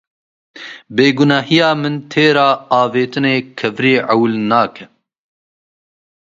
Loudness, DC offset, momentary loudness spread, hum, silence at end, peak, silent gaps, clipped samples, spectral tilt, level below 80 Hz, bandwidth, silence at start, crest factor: -14 LUFS; under 0.1%; 10 LU; none; 1.5 s; 0 dBFS; none; under 0.1%; -6 dB/octave; -60 dBFS; 7.6 kHz; 0.55 s; 16 dB